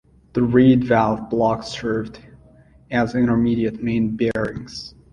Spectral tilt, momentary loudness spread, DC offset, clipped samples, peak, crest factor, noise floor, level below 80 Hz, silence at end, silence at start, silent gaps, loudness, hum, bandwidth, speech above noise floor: -7.5 dB/octave; 13 LU; under 0.1%; under 0.1%; -2 dBFS; 18 dB; -50 dBFS; -46 dBFS; 0.25 s; 0.35 s; none; -20 LUFS; none; 9 kHz; 31 dB